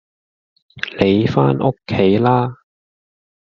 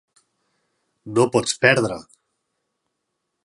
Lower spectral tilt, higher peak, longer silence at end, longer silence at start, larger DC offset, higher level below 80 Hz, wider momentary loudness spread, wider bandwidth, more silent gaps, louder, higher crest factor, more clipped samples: first, -6 dB/octave vs -4 dB/octave; about the same, 0 dBFS vs 0 dBFS; second, 0.95 s vs 1.4 s; second, 0.75 s vs 1.05 s; neither; first, -50 dBFS vs -62 dBFS; about the same, 11 LU vs 10 LU; second, 7 kHz vs 11.5 kHz; neither; first, -16 LUFS vs -19 LUFS; second, 18 dB vs 24 dB; neither